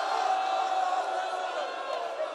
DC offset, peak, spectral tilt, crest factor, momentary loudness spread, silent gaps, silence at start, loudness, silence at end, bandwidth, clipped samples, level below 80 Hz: under 0.1%; -16 dBFS; 0 dB/octave; 14 dB; 6 LU; none; 0 s; -30 LUFS; 0 s; 12 kHz; under 0.1%; under -90 dBFS